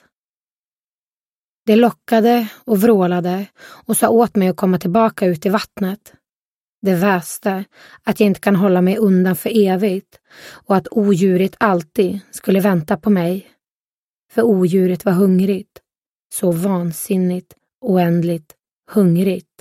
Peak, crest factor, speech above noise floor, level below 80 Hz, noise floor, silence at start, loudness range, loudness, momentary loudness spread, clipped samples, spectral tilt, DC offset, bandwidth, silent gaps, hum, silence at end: 0 dBFS; 16 dB; over 74 dB; -58 dBFS; under -90 dBFS; 1.65 s; 3 LU; -16 LUFS; 10 LU; under 0.1%; -6.5 dB/octave; under 0.1%; 16 kHz; 6.36-6.82 s, 13.71-14.26 s, 16.09-16.30 s, 17.75-17.79 s, 18.76-18.80 s; none; 0.2 s